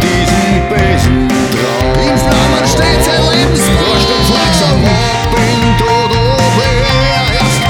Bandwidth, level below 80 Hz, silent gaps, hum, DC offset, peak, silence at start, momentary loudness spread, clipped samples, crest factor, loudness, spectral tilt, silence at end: 18 kHz; -20 dBFS; none; none; under 0.1%; 0 dBFS; 0 s; 2 LU; under 0.1%; 10 dB; -10 LUFS; -4.5 dB/octave; 0 s